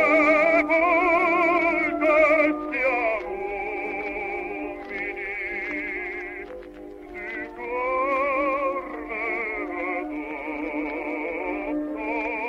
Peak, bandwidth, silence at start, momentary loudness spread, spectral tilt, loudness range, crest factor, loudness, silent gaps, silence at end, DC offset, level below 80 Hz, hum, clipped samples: -8 dBFS; 8.8 kHz; 0 s; 14 LU; -5.5 dB/octave; 10 LU; 18 dB; -24 LUFS; none; 0 s; under 0.1%; -52 dBFS; none; under 0.1%